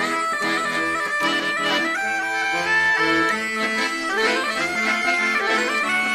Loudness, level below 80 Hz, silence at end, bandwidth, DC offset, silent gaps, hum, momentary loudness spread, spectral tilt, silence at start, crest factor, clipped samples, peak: -20 LUFS; -58 dBFS; 0 s; 15.5 kHz; under 0.1%; none; none; 4 LU; -2 dB/octave; 0 s; 14 dB; under 0.1%; -6 dBFS